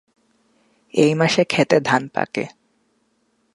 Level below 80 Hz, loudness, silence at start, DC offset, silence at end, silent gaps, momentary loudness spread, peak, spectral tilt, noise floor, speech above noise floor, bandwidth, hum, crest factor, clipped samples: -64 dBFS; -19 LUFS; 0.95 s; under 0.1%; 1.05 s; none; 10 LU; 0 dBFS; -5 dB/octave; -66 dBFS; 48 dB; 11.5 kHz; none; 20 dB; under 0.1%